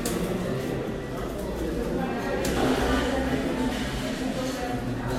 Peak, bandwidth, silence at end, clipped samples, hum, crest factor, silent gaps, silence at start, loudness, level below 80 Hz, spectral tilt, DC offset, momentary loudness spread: -12 dBFS; 16 kHz; 0 s; under 0.1%; none; 16 dB; none; 0 s; -28 LUFS; -38 dBFS; -5.5 dB/octave; under 0.1%; 7 LU